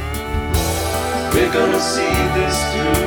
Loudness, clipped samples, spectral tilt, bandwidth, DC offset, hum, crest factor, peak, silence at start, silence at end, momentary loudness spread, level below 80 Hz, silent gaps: -18 LUFS; under 0.1%; -4.5 dB/octave; 19.5 kHz; under 0.1%; none; 14 dB; -4 dBFS; 0 s; 0 s; 5 LU; -28 dBFS; none